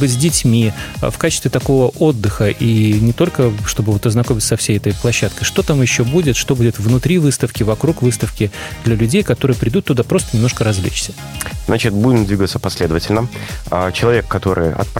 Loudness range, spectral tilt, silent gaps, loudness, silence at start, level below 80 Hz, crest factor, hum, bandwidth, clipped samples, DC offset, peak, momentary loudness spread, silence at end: 2 LU; -5.5 dB/octave; none; -15 LUFS; 0 s; -32 dBFS; 14 dB; none; 16.5 kHz; under 0.1%; under 0.1%; -2 dBFS; 6 LU; 0 s